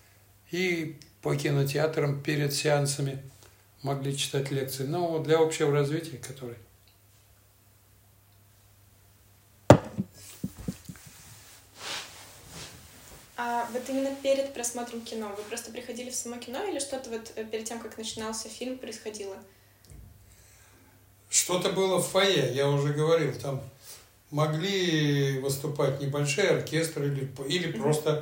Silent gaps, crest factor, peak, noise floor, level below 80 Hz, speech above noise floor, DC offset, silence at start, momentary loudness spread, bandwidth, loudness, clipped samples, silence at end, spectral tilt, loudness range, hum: none; 30 dB; 0 dBFS; -60 dBFS; -60 dBFS; 31 dB; under 0.1%; 0.5 s; 19 LU; 16.5 kHz; -29 LUFS; under 0.1%; 0 s; -4.5 dB/octave; 11 LU; none